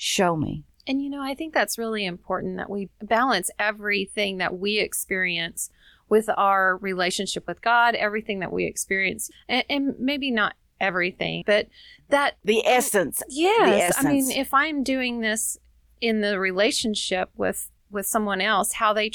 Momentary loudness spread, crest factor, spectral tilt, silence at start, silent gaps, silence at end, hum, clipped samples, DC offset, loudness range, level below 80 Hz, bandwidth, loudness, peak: 10 LU; 18 dB; -3 dB/octave; 0 s; none; 0.05 s; none; under 0.1%; under 0.1%; 4 LU; -56 dBFS; 19.5 kHz; -23 LUFS; -6 dBFS